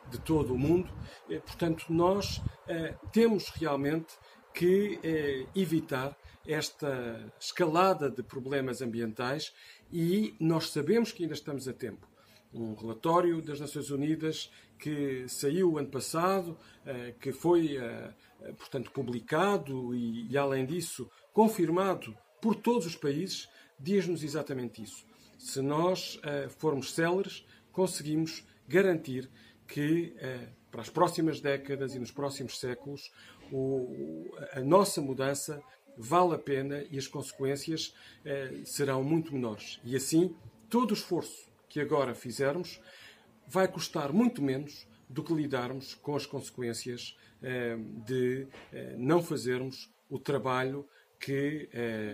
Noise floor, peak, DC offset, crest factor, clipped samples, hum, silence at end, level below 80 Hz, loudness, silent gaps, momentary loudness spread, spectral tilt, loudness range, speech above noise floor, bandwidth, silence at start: -56 dBFS; -10 dBFS; under 0.1%; 22 dB; under 0.1%; none; 0 s; -60 dBFS; -32 LUFS; none; 15 LU; -5.5 dB/octave; 3 LU; 25 dB; 15.5 kHz; 0.05 s